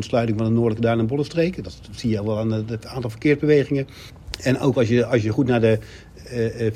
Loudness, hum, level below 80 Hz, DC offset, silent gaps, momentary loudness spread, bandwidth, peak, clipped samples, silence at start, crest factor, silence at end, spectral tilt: -21 LUFS; none; -46 dBFS; under 0.1%; none; 15 LU; 14 kHz; -4 dBFS; under 0.1%; 0 s; 16 dB; 0 s; -7.5 dB/octave